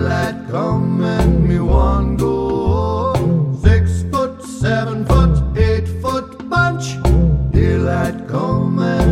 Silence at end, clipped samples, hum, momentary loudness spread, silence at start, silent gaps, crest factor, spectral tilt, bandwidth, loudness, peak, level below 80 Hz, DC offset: 0 s; under 0.1%; none; 6 LU; 0 s; none; 14 dB; -7.5 dB/octave; 12.5 kHz; -16 LUFS; 0 dBFS; -20 dBFS; under 0.1%